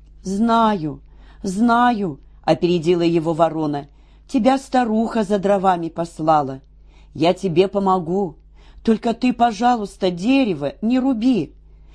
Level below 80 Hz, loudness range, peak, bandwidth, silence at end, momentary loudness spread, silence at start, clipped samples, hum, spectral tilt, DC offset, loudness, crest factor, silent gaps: -46 dBFS; 1 LU; -2 dBFS; 11 kHz; 0.45 s; 10 LU; 0.25 s; under 0.1%; none; -6.5 dB/octave; under 0.1%; -19 LUFS; 18 dB; none